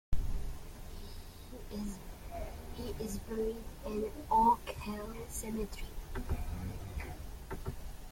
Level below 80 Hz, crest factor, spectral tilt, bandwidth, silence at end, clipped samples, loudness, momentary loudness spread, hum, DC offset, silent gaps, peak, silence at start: -44 dBFS; 20 dB; -5.5 dB/octave; 16.5 kHz; 0 s; under 0.1%; -38 LUFS; 17 LU; none; under 0.1%; none; -18 dBFS; 0.1 s